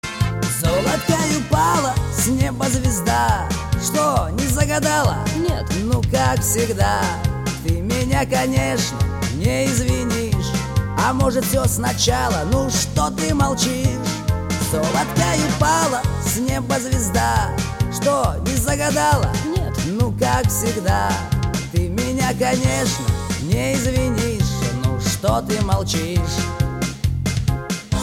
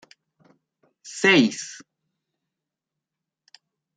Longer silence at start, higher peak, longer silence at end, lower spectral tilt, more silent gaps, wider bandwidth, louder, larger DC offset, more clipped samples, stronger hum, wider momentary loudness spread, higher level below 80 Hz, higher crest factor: second, 0.05 s vs 1.05 s; about the same, -2 dBFS vs -4 dBFS; second, 0 s vs 2.2 s; about the same, -4.5 dB/octave vs -3.5 dB/octave; neither; first, 17 kHz vs 9.4 kHz; about the same, -19 LUFS vs -19 LUFS; neither; neither; neither; second, 5 LU vs 22 LU; first, -30 dBFS vs -74 dBFS; second, 16 dB vs 24 dB